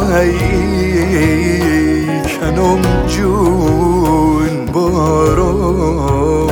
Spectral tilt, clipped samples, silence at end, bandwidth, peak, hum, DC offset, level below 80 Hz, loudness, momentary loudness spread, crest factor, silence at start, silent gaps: -6.5 dB/octave; under 0.1%; 0 s; 18.5 kHz; 0 dBFS; none; under 0.1%; -22 dBFS; -13 LUFS; 3 LU; 12 dB; 0 s; none